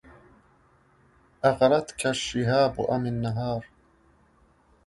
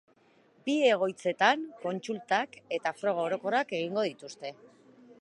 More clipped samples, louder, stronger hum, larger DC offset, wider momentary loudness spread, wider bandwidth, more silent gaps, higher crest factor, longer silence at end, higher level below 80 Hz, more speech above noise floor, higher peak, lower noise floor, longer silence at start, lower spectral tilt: neither; first, -25 LUFS vs -30 LUFS; neither; neither; second, 8 LU vs 13 LU; about the same, 11.5 kHz vs 11 kHz; neither; about the same, 22 dB vs 22 dB; first, 1.2 s vs 0.1 s; first, -54 dBFS vs -86 dBFS; about the same, 37 dB vs 34 dB; about the same, -6 dBFS vs -8 dBFS; about the same, -61 dBFS vs -64 dBFS; first, 1.45 s vs 0.65 s; about the same, -5.5 dB/octave vs -4.5 dB/octave